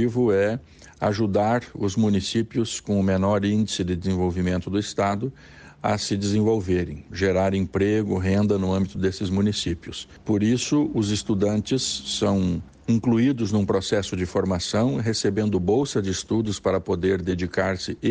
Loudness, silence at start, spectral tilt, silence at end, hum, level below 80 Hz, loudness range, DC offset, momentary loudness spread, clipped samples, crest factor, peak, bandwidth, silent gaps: -24 LUFS; 0 s; -5.5 dB/octave; 0 s; none; -48 dBFS; 2 LU; under 0.1%; 5 LU; under 0.1%; 14 dB; -10 dBFS; 9.8 kHz; none